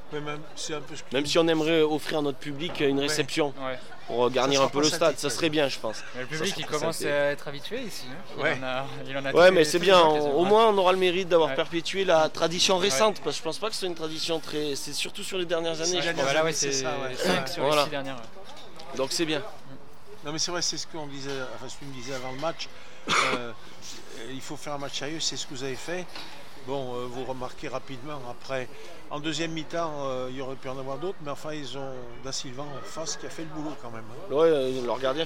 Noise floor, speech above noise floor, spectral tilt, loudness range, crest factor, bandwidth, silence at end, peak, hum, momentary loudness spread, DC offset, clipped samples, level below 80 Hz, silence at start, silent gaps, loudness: -49 dBFS; 22 dB; -3.5 dB/octave; 12 LU; 20 dB; 16.5 kHz; 0 s; -8 dBFS; none; 17 LU; 2%; under 0.1%; -60 dBFS; 0.05 s; none; -27 LUFS